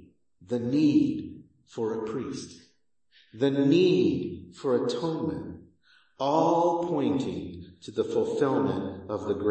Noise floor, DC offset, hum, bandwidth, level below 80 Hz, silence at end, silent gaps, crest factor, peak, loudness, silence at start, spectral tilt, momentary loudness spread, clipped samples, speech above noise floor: -68 dBFS; under 0.1%; none; 8.6 kHz; -64 dBFS; 0 s; none; 18 dB; -8 dBFS; -27 LUFS; 0.4 s; -7 dB/octave; 15 LU; under 0.1%; 42 dB